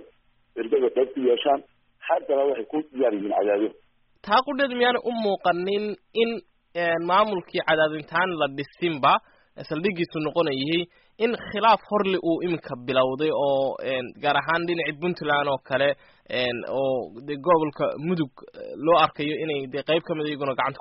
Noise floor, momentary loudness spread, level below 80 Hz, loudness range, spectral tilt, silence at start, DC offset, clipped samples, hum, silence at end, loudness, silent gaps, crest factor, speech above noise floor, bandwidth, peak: -60 dBFS; 8 LU; -64 dBFS; 1 LU; -3 dB/octave; 0 s; under 0.1%; under 0.1%; none; 0 s; -24 LUFS; none; 16 dB; 36 dB; 5.8 kHz; -8 dBFS